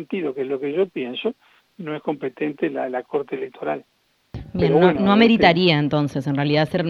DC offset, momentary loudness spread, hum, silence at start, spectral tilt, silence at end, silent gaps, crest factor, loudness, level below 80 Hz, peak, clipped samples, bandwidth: under 0.1%; 15 LU; none; 0 s; -7.5 dB/octave; 0 s; none; 20 dB; -20 LUFS; -50 dBFS; 0 dBFS; under 0.1%; 11.5 kHz